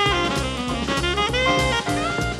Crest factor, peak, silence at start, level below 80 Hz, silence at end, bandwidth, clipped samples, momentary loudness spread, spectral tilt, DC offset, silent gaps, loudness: 16 dB; -6 dBFS; 0 s; -34 dBFS; 0 s; 15.5 kHz; under 0.1%; 6 LU; -4 dB/octave; under 0.1%; none; -21 LUFS